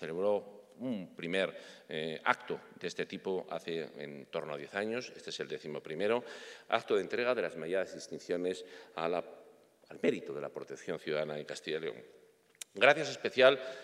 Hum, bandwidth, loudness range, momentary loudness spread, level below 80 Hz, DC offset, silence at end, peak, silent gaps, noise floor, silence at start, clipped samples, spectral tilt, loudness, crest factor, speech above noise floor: none; 13.5 kHz; 5 LU; 17 LU; -86 dBFS; under 0.1%; 0 s; -8 dBFS; none; -61 dBFS; 0 s; under 0.1%; -4 dB/octave; -35 LUFS; 26 dB; 26 dB